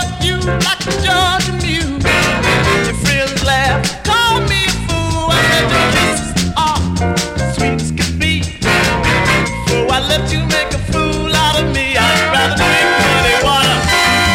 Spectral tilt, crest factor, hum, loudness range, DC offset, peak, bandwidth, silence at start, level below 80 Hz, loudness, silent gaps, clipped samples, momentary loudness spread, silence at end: -3.5 dB/octave; 14 dB; none; 3 LU; under 0.1%; 0 dBFS; 16.5 kHz; 0 s; -28 dBFS; -13 LUFS; none; under 0.1%; 6 LU; 0 s